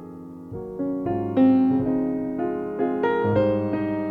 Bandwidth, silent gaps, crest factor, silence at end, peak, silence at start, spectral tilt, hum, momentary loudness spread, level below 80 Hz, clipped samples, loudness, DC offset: 4.6 kHz; none; 14 dB; 0 s; -8 dBFS; 0 s; -10 dB/octave; none; 16 LU; -54 dBFS; under 0.1%; -23 LUFS; under 0.1%